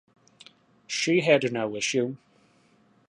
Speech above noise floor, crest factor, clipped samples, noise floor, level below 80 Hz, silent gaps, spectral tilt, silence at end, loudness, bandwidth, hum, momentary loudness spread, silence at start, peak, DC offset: 38 dB; 24 dB; under 0.1%; -62 dBFS; -74 dBFS; none; -4 dB/octave; 0.9 s; -25 LUFS; 11 kHz; none; 12 LU; 0.9 s; -4 dBFS; under 0.1%